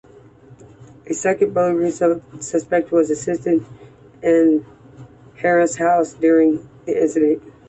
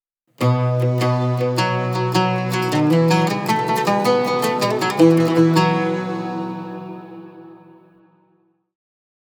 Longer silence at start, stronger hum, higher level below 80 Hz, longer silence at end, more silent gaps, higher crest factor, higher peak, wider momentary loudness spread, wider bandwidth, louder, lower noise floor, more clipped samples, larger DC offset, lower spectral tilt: about the same, 0.5 s vs 0.4 s; neither; first, -58 dBFS vs -74 dBFS; second, 0.2 s vs 1.75 s; neither; about the same, 14 dB vs 18 dB; about the same, -4 dBFS vs -2 dBFS; second, 9 LU vs 14 LU; second, 8.4 kHz vs over 20 kHz; about the same, -18 LUFS vs -18 LUFS; second, -45 dBFS vs -62 dBFS; neither; neither; about the same, -6 dB/octave vs -6.5 dB/octave